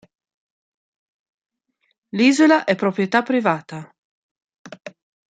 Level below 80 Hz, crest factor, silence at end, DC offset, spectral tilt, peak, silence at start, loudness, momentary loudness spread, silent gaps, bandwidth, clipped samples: -70 dBFS; 20 dB; 0.4 s; under 0.1%; -5 dB/octave; -2 dBFS; 2.15 s; -18 LUFS; 24 LU; 3.98-4.36 s, 4.58-4.65 s; 9.4 kHz; under 0.1%